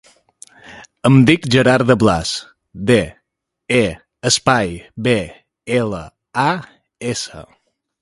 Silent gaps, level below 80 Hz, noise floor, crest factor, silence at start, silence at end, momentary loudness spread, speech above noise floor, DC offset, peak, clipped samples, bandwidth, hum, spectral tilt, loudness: none; -44 dBFS; -75 dBFS; 18 dB; 0.7 s; 0.6 s; 14 LU; 59 dB; under 0.1%; 0 dBFS; under 0.1%; 11.5 kHz; none; -5 dB/octave; -16 LUFS